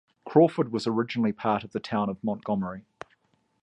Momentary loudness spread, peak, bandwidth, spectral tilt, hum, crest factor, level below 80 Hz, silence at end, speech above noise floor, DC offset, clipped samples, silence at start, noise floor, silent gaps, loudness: 21 LU; -6 dBFS; 9.8 kHz; -7.5 dB/octave; none; 20 dB; -64 dBFS; 0.85 s; 43 dB; under 0.1%; under 0.1%; 0.25 s; -69 dBFS; none; -27 LUFS